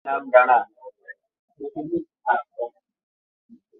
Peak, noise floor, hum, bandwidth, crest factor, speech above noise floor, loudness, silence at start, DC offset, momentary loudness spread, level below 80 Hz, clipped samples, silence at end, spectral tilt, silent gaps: -2 dBFS; -47 dBFS; none; 4 kHz; 22 dB; 27 dB; -21 LUFS; 0.05 s; under 0.1%; 21 LU; -72 dBFS; under 0.1%; 1.1 s; -9 dB/octave; 1.39-1.48 s